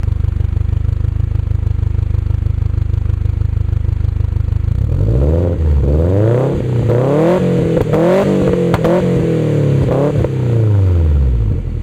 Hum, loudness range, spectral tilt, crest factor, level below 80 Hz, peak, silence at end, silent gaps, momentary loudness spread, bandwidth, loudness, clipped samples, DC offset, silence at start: none; 4 LU; -9.5 dB/octave; 10 dB; -20 dBFS; -2 dBFS; 0 s; none; 5 LU; 9.2 kHz; -15 LUFS; under 0.1%; under 0.1%; 0 s